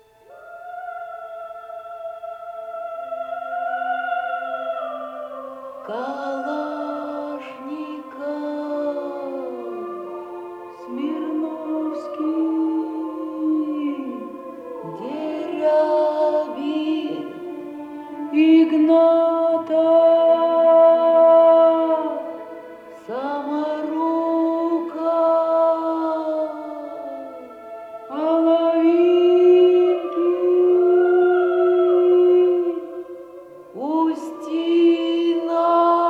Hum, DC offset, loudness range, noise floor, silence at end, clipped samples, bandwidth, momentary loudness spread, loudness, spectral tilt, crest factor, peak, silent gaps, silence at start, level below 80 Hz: none; under 0.1%; 13 LU; -45 dBFS; 0 s; under 0.1%; 5.2 kHz; 20 LU; -19 LUFS; -6 dB/octave; 14 dB; -6 dBFS; none; 0.3 s; -72 dBFS